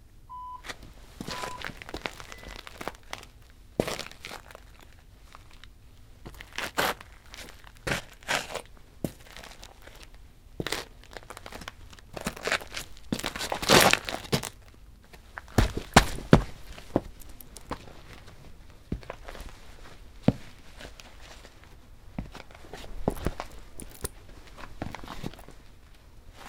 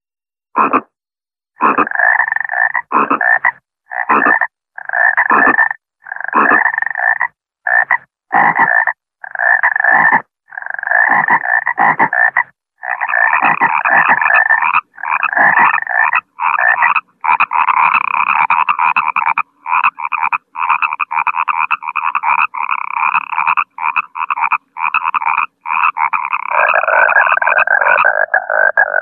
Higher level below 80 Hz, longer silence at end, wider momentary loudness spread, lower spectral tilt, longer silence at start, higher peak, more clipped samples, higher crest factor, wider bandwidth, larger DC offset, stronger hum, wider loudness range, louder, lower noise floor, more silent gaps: first, -44 dBFS vs -64 dBFS; about the same, 0 s vs 0 s; first, 27 LU vs 8 LU; second, -4 dB/octave vs -6.5 dB/octave; second, 0.05 s vs 0.55 s; about the same, 0 dBFS vs 0 dBFS; neither; first, 32 dB vs 14 dB; first, 18 kHz vs 4.3 kHz; neither; neither; first, 14 LU vs 4 LU; second, -30 LUFS vs -12 LUFS; second, -51 dBFS vs under -90 dBFS; neither